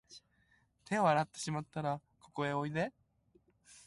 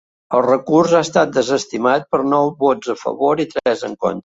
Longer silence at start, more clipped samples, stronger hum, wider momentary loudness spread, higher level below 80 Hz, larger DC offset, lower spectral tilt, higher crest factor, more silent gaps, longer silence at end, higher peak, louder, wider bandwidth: second, 0.1 s vs 0.3 s; neither; neither; first, 10 LU vs 6 LU; second, -72 dBFS vs -58 dBFS; neither; about the same, -5.5 dB/octave vs -5 dB/octave; first, 20 dB vs 14 dB; neither; about the same, 0.1 s vs 0.05 s; second, -18 dBFS vs -2 dBFS; second, -36 LUFS vs -17 LUFS; first, 11.5 kHz vs 8 kHz